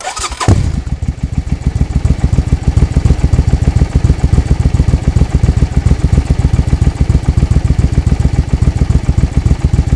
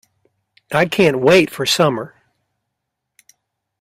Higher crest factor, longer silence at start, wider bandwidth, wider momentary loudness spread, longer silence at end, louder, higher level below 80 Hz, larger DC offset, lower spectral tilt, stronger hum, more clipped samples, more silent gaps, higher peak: second, 10 dB vs 18 dB; second, 0 s vs 0.7 s; second, 11 kHz vs 16 kHz; second, 4 LU vs 12 LU; second, 0 s vs 1.75 s; about the same, -13 LUFS vs -15 LUFS; first, -14 dBFS vs -56 dBFS; first, 0.4% vs under 0.1%; first, -7 dB/octave vs -4.5 dB/octave; neither; first, 2% vs under 0.1%; neither; about the same, 0 dBFS vs 0 dBFS